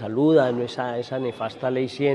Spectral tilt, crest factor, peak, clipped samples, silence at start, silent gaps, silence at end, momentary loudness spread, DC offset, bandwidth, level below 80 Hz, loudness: -7 dB/octave; 16 dB; -6 dBFS; under 0.1%; 0 s; none; 0 s; 10 LU; under 0.1%; 10.5 kHz; -70 dBFS; -23 LUFS